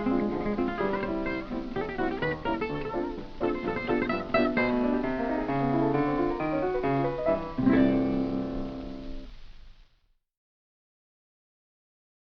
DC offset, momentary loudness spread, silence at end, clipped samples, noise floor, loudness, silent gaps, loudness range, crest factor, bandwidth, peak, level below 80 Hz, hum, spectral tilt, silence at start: under 0.1%; 9 LU; 2.45 s; under 0.1%; -68 dBFS; -28 LUFS; none; 8 LU; 18 dB; 6.2 kHz; -12 dBFS; -44 dBFS; none; -8.5 dB/octave; 0 s